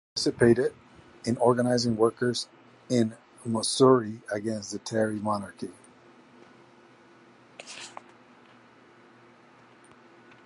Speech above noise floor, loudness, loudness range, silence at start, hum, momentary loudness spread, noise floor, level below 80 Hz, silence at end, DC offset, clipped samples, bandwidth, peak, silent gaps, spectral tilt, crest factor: 30 dB; -26 LUFS; 23 LU; 0.15 s; none; 20 LU; -56 dBFS; -64 dBFS; 2.55 s; under 0.1%; under 0.1%; 11.5 kHz; -8 dBFS; none; -5 dB/octave; 22 dB